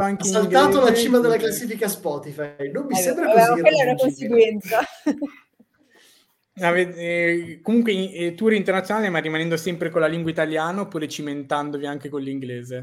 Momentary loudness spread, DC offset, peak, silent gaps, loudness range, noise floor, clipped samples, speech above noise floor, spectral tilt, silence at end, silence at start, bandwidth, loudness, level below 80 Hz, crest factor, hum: 13 LU; under 0.1%; -2 dBFS; none; 5 LU; -59 dBFS; under 0.1%; 39 dB; -4.5 dB/octave; 0 s; 0 s; 17 kHz; -21 LUFS; -64 dBFS; 20 dB; none